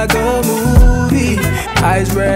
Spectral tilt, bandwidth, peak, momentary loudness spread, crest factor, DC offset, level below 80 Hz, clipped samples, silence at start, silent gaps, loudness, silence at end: -5.5 dB/octave; 16.5 kHz; 0 dBFS; 4 LU; 12 dB; under 0.1%; -16 dBFS; under 0.1%; 0 s; none; -13 LUFS; 0 s